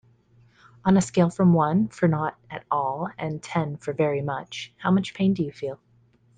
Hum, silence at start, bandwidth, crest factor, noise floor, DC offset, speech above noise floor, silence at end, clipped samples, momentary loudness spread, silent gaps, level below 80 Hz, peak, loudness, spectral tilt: none; 0.85 s; 9.4 kHz; 18 dB; -60 dBFS; under 0.1%; 36 dB; 0.6 s; under 0.1%; 12 LU; none; -58 dBFS; -6 dBFS; -24 LUFS; -7 dB/octave